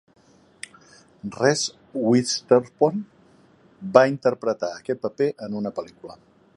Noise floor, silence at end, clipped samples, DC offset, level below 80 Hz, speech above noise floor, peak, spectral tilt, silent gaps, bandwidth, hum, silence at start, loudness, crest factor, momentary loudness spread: -55 dBFS; 0.4 s; under 0.1%; under 0.1%; -68 dBFS; 33 dB; 0 dBFS; -4.5 dB/octave; none; 11.5 kHz; none; 1.25 s; -22 LUFS; 24 dB; 22 LU